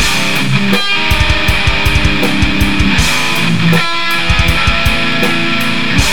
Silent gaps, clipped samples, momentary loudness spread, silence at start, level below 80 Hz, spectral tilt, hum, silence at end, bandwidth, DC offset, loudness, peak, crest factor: none; under 0.1%; 2 LU; 0 s; -20 dBFS; -4 dB/octave; none; 0 s; 18.5 kHz; 10%; -11 LUFS; 0 dBFS; 14 dB